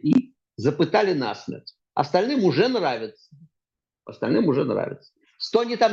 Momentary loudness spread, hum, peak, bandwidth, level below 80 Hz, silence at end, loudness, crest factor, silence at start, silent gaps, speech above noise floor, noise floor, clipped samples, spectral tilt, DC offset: 15 LU; none; -4 dBFS; 7.4 kHz; -68 dBFS; 0 s; -23 LUFS; 18 dB; 0.05 s; none; 64 dB; -87 dBFS; under 0.1%; -6.5 dB/octave; under 0.1%